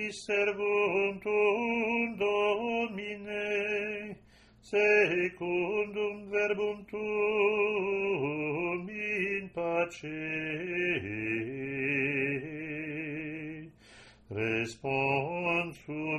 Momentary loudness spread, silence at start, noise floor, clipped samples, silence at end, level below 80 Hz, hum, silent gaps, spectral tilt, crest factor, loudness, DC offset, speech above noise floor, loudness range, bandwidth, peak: 10 LU; 0 s; -59 dBFS; under 0.1%; 0 s; -66 dBFS; none; none; -6 dB/octave; 18 dB; -31 LUFS; under 0.1%; 28 dB; 5 LU; 10.5 kHz; -14 dBFS